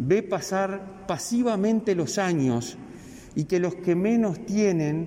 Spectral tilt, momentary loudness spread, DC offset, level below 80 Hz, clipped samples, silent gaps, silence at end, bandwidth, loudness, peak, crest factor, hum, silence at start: -6 dB/octave; 12 LU; under 0.1%; -58 dBFS; under 0.1%; none; 0 s; 16 kHz; -25 LUFS; -10 dBFS; 14 dB; none; 0 s